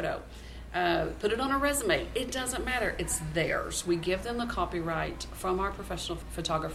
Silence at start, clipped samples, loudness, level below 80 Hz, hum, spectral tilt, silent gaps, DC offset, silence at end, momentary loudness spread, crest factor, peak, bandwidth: 0 s; under 0.1%; -31 LUFS; -44 dBFS; none; -3.5 dB/octave; none; under 0.1%; 0 s; 8 LU; 20 dB; -12 dBFS; 16 kHz